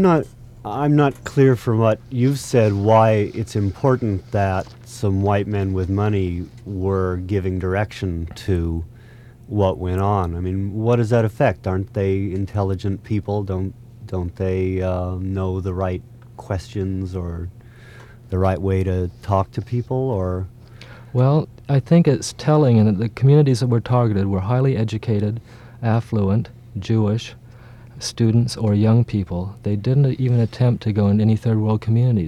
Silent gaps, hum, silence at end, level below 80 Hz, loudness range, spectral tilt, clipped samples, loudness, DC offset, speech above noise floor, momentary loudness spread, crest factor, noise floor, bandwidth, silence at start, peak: none; none; 0 s; -46 dBFS; 7 LU; -8 dB/octave; under 0.1%; -20 LUFS; under 0.1%; 24 dB; 11 LU; 18 dB; -43 dBFS; 12.5 kHz; 0 s; -2 dBFS